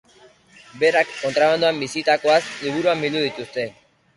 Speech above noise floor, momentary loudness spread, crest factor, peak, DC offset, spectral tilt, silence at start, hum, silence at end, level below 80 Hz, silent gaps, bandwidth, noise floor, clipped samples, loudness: 32 dB; 10 LU; 18 dB; -4 dBFS; under 0.1%; -4 dB/octave; 0.75 s; none; 0.45 s; -64 dBFS; none; 11.5 kHz; -52 dBFS; under 0.1%; -20 LUFS